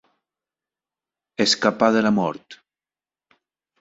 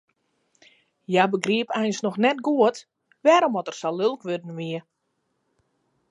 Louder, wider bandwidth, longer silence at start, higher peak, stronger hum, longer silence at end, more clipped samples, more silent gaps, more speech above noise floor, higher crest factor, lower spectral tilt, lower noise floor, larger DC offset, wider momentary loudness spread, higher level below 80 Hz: first, -19 LUFS vs -23 LUFS; second, 8 kHz vs 11 kHz; first, 1.4 s vs 1.1 s; about the same, -2 dBFS vs -4 dBFS; neither; about the same, 1.25 s vs 1.3 s; neither; neither; first, over 70 dB vs 52 dB; about the same, 22 dB vs 22 dB; about the same, -4 dB/octave vs -5 dB/octave; first, under -90 dBFS vs -75 dBFS; neither; first, 16 LU vs 13 LU; first, -64 dBFS vs -78 dBFS